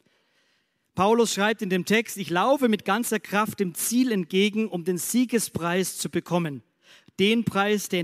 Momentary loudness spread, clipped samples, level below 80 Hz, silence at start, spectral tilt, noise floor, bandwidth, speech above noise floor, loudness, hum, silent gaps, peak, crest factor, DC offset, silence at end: 6 LU; under 0.1%; -66 dBFS; 0.95 s; -4 dB/octave; -70 dBFS; 15.5 kHz; 46 dB; -24 LUFS; none; none; -8 dBFS; 18 dB; under 0.1%; 0 s